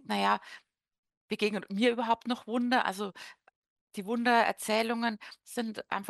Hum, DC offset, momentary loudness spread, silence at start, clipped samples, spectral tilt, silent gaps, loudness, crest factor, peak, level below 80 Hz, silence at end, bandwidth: none; under 0.1%; 16 LU; 0.1 s; under 0.1%; -4 dB/octave; 0.98-1.03 s, 1.17-1.28 s, 3.56-3.62 s, 3.70-3.87 s; -30 LUFS; 20 dB; -12 dBFS; -80 dBFS; 0 s; 12.5 kHz